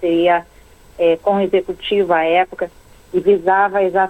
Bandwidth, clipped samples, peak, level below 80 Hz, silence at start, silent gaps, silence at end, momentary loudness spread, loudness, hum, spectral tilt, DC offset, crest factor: 8.4 kHz; under 0.1%; -4 dBFS; -48 dBFS; 0 s; none; 0 s; 7 LU; -16 LUFS; none; -6.5 dB/octave; under 0.1%; 12 dB